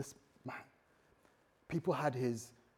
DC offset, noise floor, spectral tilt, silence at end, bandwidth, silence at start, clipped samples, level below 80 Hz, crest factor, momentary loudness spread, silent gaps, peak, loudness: under 0.1%; -71 dBFS; -6 dB/octave; 0.25 s; 17 kHz; 0 s; under 0.1%; -74 dBFS; 20 dB; 15 LU; none; -22 dBFS; -40 LUFS